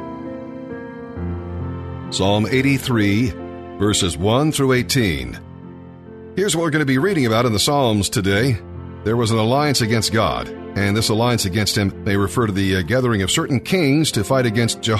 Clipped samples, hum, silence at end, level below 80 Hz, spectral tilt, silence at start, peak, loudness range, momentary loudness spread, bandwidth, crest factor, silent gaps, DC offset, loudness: under 0.1%; none; 0 s; -42 dBFS; -5 dB/octave; 0 s; -4 dBFS; 2 LU; 15 LU; 13.5 kHz; 14 dB; none; under 0.1%; -18 LUFS